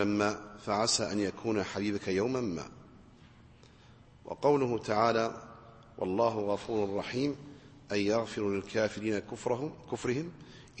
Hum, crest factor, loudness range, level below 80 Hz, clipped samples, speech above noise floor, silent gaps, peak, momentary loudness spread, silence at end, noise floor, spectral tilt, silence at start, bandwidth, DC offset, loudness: none; 20 dB; 3 LU; -62 dBFS; under 0.1%; 25 dB; none; -12 dBFS; 16 LU; 0 s; -57 dBFS; -4.5 dB/octave; 0 s; 8.8 kHz; under 0.1%; -32 LUFS